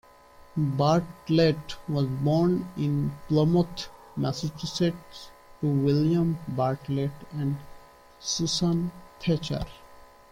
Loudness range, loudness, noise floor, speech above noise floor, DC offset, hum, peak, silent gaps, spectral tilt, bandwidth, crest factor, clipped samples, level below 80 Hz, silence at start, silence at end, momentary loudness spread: 4 LU; -27 LUFS; -52 dBFS; 27 dB; under 0.1%; none; -10 dBFS; none; -6.5 dB/octave; 16 kHz; 16 dB; under 0.1%; -52 dBFS; 0.55 s; 0.3 s; 12 LU